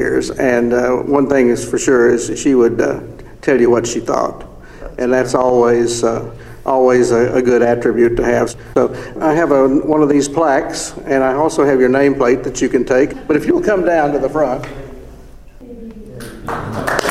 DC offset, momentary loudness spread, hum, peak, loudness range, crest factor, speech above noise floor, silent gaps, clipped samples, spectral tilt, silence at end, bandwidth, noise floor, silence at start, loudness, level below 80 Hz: under 0.1%; 13 LU; none; 0 dBFS; 3 LU; 14 dB; 23 dB; none; under 0.1%; -5.5 dB/octave; 0 s; 13.5 kHz; -36 dBFS; 0 s; -14 LUFS; -38 dBFS